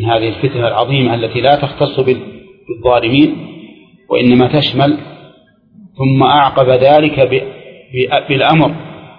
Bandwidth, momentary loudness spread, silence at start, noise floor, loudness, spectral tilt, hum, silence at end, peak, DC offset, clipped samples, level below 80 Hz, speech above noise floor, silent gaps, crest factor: 5.2 kHz; 11 LU; 0 s; -46 dBFS; -12 LUFS; -9.5 dB/octave; none; 0.1 s; 0 dBFS; under 0.1%; under 0.1%; -44 dBFS; 35 dB; none; 12 dB